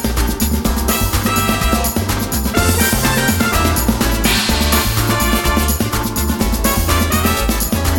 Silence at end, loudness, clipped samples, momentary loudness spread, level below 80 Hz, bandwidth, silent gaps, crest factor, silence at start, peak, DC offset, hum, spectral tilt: 0 s; -15 LUFS; under 0.1%; 4 LU; -20 dBFS; 19.5 kHz; none; 14 dB; 0 s; 0 dBFS; under 0.1%; none; -4 dB/octave